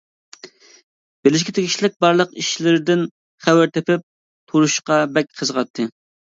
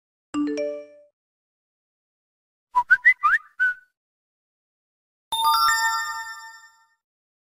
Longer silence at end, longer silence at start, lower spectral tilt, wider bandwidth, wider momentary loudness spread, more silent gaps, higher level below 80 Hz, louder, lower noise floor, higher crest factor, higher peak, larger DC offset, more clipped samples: second, 0.5 s vs 1 s; about the same, 0.45 s vs 0.35 s; first, -4.5 dB/octave vs 0 dB/octave; second, 7.8 kHz vs 16 kHz; second, 7 LU vs 18 LU; second, 0.84-1.23 s, 1.96-2.00 s, 3.11-3.38 s, 4.03-4.47 s, 5.70-5.74 s vs 1.13-2.67 s, 3.97-5.31 s; about the same, -66 dBFS vs -64 dBFS; first, -18 LUFS vs -21 LUFS; second, -44 dBFS vs -52 dBFS; about the same, 18 dB vs 20 dB; first, 0 dBFS vs -6 dBFS; neither; neither